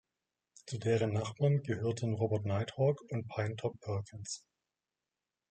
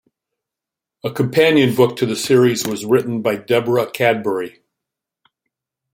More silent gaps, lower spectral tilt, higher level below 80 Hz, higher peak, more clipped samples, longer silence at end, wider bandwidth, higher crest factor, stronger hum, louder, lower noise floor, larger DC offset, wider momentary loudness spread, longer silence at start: neither; first, -6.5 dB/octave vs -5 dB/octave; second, -72 dBFS vs -60 dBFS; second, -18 dBFS vs -2 dBFS; neither; second, 1.15 s vs 1.45 s; second, 9 kHz vs 16.5 kHz; about the same, 18 dB vs 16 dB; neither; second, -35 LUFS vs -17 LUFS; first, under -90 dBFS vs -86 dBFS; neither; about the same, 12 LU vs 10 LU; second, 0.65 s vs 1.05 s